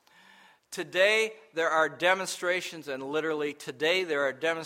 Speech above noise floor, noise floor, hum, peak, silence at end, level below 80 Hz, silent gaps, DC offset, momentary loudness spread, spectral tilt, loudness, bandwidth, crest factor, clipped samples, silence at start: 29 dB; -58 dBFS; none; -8 dBFS; 0 s; -82 dBFS; none; under 0.1%; 12 LU; -2.5 dB/octave; -28 LUFS; 16 kHz; 20 dB; under 0.1%; 0.7 s